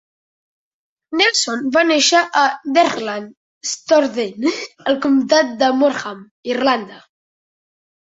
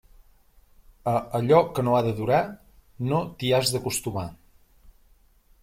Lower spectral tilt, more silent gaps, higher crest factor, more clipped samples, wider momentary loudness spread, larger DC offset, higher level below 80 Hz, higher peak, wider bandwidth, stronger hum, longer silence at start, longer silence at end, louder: second, -2 dB/octave vs -5 dB/octave; first, 3.37-3.61 s, 6.31-6.43 s vs none; about the same, 18 dB vs 22 dB; neither; about the same, 13 LU vs 13 LU; neither; second, -66 dBFS vs -54 dBFS; first, 0 dBFS vs -6 dBFS; second, 8 kHz vs 16.5 kHz; neither; about the same, 1.1 s vs 1.05 s; first, 1.1 s vs 0.7 s; first, -16 LUFS vs -24 LUFS